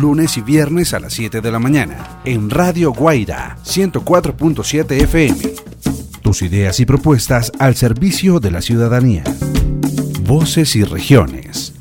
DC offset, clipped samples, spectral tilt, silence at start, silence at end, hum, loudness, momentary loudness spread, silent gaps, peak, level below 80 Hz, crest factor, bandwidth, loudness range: under 0.1%; under 0.1%; -5.5 dB/octave; 0 s; 0 s; none; -14 LUFS; 9 LU; none; 0 dBFS; -28 dBFS; 14 dB; 18 kHz; 2 LU